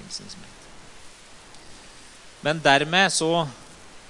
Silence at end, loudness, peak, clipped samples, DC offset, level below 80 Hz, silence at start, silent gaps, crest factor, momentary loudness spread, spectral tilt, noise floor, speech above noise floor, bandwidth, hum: 0.1 s; -21 LUFS; -2 dBFS; under 0.1%; under 0.1%; -56 dBFS; 0 s; none; 24 dB; 25 LU; -3 dB/octave; -46 dBFS; 23 dB; 11.5 kHz; none